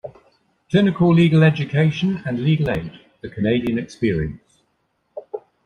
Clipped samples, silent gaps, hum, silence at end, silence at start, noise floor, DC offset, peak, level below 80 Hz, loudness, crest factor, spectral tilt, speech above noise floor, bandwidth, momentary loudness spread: under 0.1%; none; none; 0.25 s; 0.05 s; -68 dBFS; under 0.1%; -4 dBFS; -46 dBFS; -19 LUFS; 16 dB; -8 dB/octave; 51 dB; 6.6 kHz; 22 LU